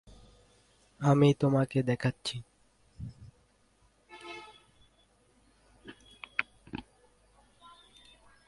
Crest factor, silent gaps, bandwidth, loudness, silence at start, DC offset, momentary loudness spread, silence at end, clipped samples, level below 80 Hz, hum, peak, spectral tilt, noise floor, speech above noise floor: 26 dB; none; 11.5 kHz; -29 LUFS; 1 s; under 0.1%; 28 LU; 1.65 s; under 0.1%; -62 dBFS; none; -8 dBFS; -7 dB/octave; -67 dBFS; 41 dB